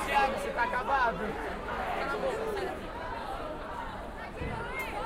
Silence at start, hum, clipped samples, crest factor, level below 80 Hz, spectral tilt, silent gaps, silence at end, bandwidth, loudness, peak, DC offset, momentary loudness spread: 0 s; none; under 0.1%; 18 dB; -46 dBFS; -5 dB/octave; none; 0 s; 16 kHz; -33 LUFS; -16 dBFS; under 0.1%; 11 LU